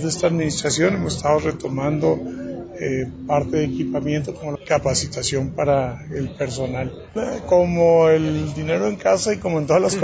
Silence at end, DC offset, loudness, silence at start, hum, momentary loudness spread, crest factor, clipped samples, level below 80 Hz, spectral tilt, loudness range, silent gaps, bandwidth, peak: 0 s; under 0.1%; -21 LUFS; 0 s; none; 11 LU; 16 dB; under 0.1%; -42 dBFS; -5 dB/octave; 4 LU; none; 8 kHz; -4 dBFS